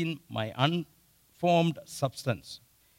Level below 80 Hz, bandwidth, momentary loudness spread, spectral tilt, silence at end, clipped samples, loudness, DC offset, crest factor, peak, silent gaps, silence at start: -68 dBFS; 16 kHz; 18 LU; -6 dB/octave; 0.4 s; under 0.1%; -30 LUFS; under 0.1%; 22 dB; -10 dBFS; none; 0 s